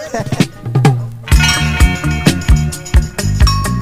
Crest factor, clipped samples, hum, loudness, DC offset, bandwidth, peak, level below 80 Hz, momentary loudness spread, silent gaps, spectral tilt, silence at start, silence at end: 12 dB; 0.2%; none; -13 LUFS; under 0.1%; 16 kHz; 0 dBFS; -16 dBFS; 5 LU; none; -5 dB/octave; 0 s; 0 s